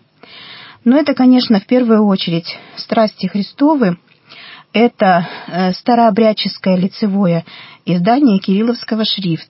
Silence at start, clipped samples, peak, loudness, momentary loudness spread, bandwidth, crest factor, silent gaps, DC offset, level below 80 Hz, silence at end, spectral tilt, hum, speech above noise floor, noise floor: 0.35 s; under 0.1%; -2 dBFS; -14 LUFS; 16 LU; 5.8 kHz; 12 dB; none; under 0.1%; -66 dBFS; 0.05 s; -10.5 dB/octave; none; 26 dB; -39 dBFS